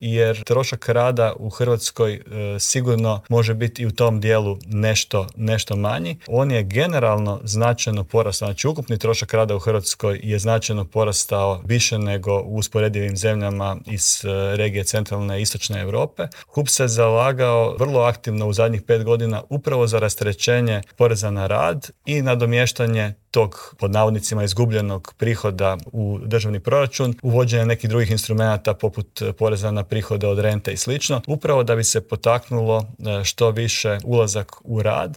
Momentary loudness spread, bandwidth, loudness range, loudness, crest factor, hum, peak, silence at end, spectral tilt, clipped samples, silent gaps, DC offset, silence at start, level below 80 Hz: 6 LU; 17 kHz; 2 LU; -20 LUFS; 16 dB; none; -4 dBFS; 0 s; -4.5 dB/octave; under 0.1%; none; under 0.1%; 0 s; -50 dBFS